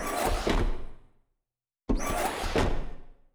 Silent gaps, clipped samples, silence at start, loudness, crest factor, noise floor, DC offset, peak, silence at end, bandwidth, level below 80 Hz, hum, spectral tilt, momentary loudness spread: none; under 0.1%; 0 s; -30 LUFS; 16 dB; -89 dBFS; under 0.1%; -14 dBFS; 0.2 s; over 20 kHz; -34 dBFS; none; -4.5 dB/octave; 17 LU